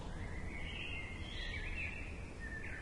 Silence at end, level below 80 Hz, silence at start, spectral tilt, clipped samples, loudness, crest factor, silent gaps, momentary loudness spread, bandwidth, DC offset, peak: 0 s; -48 dBFS; 0 s; -5 dB/octave; under 0.1%; -44 LUFS; 14 dB; none; 5 LU; 11.5 kHz; under 0.1%; -30 dBFS